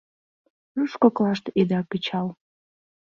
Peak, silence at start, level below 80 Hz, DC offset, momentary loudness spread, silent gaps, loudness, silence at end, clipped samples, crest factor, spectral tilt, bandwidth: -6 dBFS; 0.75 s; -66 dBFS; under 0.1%; 10 LU; none; -24 LUFS; 0.75 s; under 0.1%; 20 dB; -7.5 dB/octave; 7.2 kHz